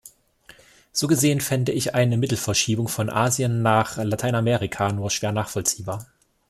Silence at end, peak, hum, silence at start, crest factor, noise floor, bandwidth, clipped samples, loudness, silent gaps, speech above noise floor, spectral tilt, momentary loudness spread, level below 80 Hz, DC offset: 0.45 s; -4 dBFS; none; 0.05 s; 20 dB; -52 dBFS; 15.5 kHz; under 0.1%; -22 LUFS; none; 30 dB; -4.5 dB/octave; 6 LU; -54 dBFS; under 0.1%